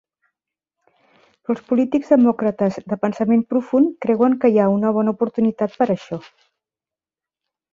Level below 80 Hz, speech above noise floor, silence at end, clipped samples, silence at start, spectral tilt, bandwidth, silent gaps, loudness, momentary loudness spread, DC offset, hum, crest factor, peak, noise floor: -64 dBFS; over 72 dB; 1.5 s; under 0.1%; 1.5 s; -9 dB/octave; 7.2 kHz; none; -19 LUFS; 10 LU; under 0.1%; none; 18 dB; -2 dBFS; under -90 dBFS